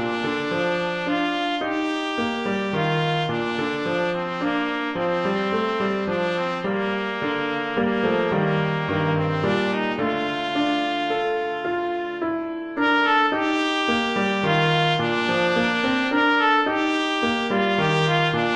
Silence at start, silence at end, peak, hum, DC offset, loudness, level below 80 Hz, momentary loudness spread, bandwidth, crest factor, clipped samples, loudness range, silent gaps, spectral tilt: 0 s; 0 s; -6 dBFS; none; under 0.1%; -22 LUFS; -56 dBFS; 5 LU; 10 kHz; 16 dB; under 0.1%; 4 LU; none; -6 dB/octave